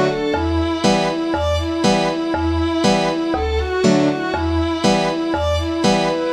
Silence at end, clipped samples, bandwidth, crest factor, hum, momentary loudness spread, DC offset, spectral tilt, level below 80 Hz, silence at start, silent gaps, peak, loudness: 0 s; under 0.1%; 12.5 kHz; 16 dB; none; 4 LU; under 0.1%; -5.5 dB/octave; -30 dBFS; 0 s; none; -2 dBFS; -18 LUFS